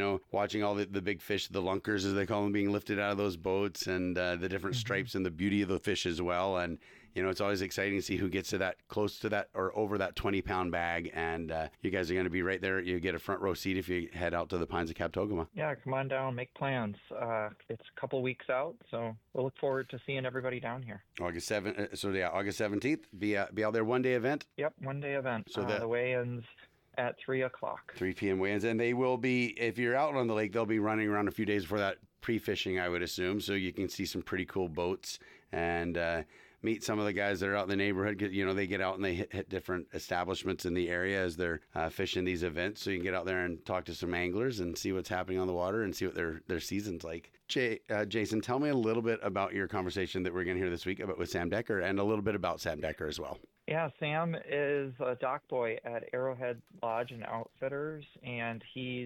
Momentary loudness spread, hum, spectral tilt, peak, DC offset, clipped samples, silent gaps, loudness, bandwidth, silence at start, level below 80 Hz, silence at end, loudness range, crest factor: 7 LU; none; -5.5 dB/octave; -18 dBFS; under 0.1%; under 0.1%; none; -34 LUFS; 17.5 kHz; 0 s; -60 dBFS; 0 s; 4 LU; 16 dB